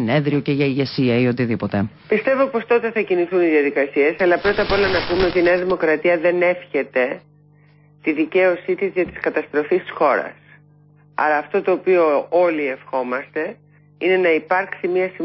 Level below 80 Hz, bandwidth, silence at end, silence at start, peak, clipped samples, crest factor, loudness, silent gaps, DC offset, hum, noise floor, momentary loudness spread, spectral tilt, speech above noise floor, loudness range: -48 dBFS; 5.8 kHz; 0 s; 0 s; -4 dBFS; under 0.1%; 16 dB; -19 LUFS; none; under 0.1%; 50 Hz at -50 dBFS; -51 dBFS; 7 LU; -10.5 dB/octave; 33 dB; 4 LU